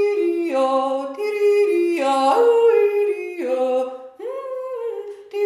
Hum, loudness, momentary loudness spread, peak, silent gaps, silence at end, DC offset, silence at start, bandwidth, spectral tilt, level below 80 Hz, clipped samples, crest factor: none; -19 LUFS; 14 LU; -6 dBFS; none; 0 s; under 0.1%; 0 s; 13.5 kHz; -3 dB/octave; -82 dBFS; under 0.1%; 12 dB